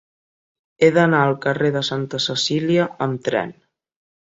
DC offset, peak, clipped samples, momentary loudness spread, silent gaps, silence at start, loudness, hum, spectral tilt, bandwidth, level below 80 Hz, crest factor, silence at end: under 0.1%; -2 dBFS; under 0.1%; 8 LU; none; 0.8 s; -19 LUFS; none; -5 dB/octave; 8 kHz; -62 dBFS; 18 dB; 0.7 s